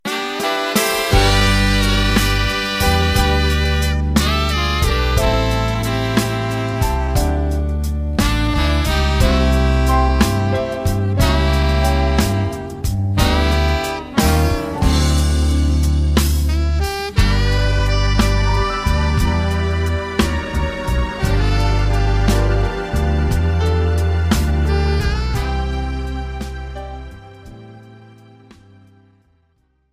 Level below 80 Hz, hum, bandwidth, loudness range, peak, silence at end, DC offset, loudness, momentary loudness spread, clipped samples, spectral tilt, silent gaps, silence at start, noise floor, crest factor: -20 dBFS; none; 15.5 kHz; 4 LU; 0 dBFS; 2 s; under 0.1%; -17 LUFS; 6 LU; under 0.1%; -5 dB/octave; none; 0.05 s; -61 dBFS; 16 dB